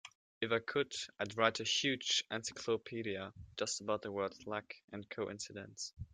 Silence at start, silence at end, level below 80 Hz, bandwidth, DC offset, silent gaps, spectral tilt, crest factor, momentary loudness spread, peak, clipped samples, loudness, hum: 0.05 s; 0.05 s; -68 dBFS; 10 kHz; under 0.1%; 0.15-0.41 s, 4.84-4.88 s; -2.5 dB/octave; 26 dB; 13 LU; -14 dBFS; under 0.1%; -38 LUFS; none